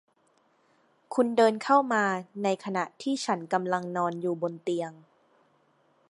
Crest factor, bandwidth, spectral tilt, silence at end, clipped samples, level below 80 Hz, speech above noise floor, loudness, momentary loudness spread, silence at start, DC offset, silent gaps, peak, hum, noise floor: 20 dB; 11.5 kHz; -5 dB/octave; 1.15 s; under 0.1%; -84 dBFS; 40 dB; -28 LUFS; 9 LU; 1.1 s; under 0.1%; none; -8 dBFS; none; -68 dBFS